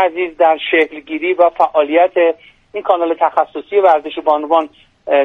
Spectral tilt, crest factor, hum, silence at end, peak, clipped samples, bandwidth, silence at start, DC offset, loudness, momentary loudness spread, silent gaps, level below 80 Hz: -5 dB/octave; 14 dB; none; 0 s; 0 dBFS; under 0.1%; 4.5 kHz; 0 s; under 0.1%; -14 LUFS; 9 LU; none; -58 dBFS